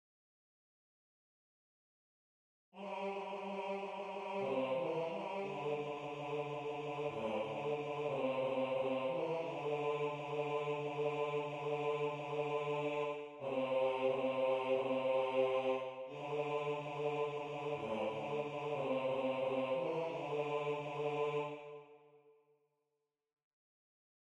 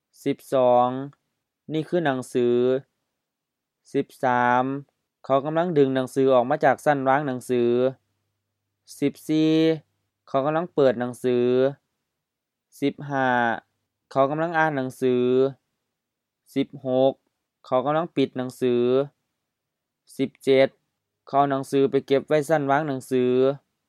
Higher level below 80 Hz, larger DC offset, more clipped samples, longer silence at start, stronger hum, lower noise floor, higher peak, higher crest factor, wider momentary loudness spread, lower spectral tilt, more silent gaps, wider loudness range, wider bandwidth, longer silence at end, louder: about the same, -80 dBFS vs -78 dBFS; neither; neither; first, 2.75 s vs 0.25 s; neither; first, -88 dBFS vs -84 dBFS; second, -22 dBFS vs -4 dBFS; about the same, 18 dB vs 20 dB; about the same, 7 LU vs 9 LU; about the same, -6.5 dB/octave vs -6.5 dB/octave; neither; first, 8 LU vs 4 LU; second, 9.4 kHz vs 13.5 kHz; first, 2.2 s vs 0.3 s; second, -39 LUFS vs -23 LUFS